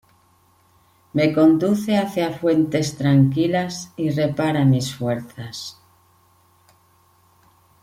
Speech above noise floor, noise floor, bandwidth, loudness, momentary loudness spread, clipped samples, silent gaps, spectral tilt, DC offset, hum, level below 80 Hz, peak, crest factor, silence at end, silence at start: 39 dB; -58 dBFS; 16 kHz; -20 LUFS; 14 LU; under 0.1%; none; -6.5 dB/octave; under 0.1%; none; -58 dBFS; -4 dBFS; 16 dB; 2.1 s; 1.15 s